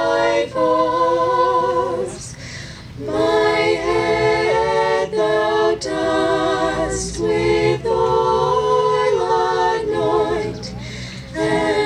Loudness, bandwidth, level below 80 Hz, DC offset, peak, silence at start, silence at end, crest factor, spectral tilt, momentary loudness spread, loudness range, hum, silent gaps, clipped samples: -18 LUFS; 11.5 kHz; -40 dBFS; under 0.1%; -4 dBFS; 0 s; 0 s; 12 dB; -5 dB/octave; 13 LU; 2 LU; none; none; under 0.1%